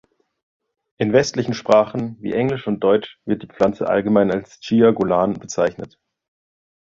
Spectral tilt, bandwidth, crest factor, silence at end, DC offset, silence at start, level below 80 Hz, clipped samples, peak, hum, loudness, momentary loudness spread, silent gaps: -6 dB/octave; 7.6 kHz; 18 dB; 1 s; under 0.1%; 1 s; -54 dBFS; under 0.1%; 0 dBFS; none; -19 LUFS; 10 LU; none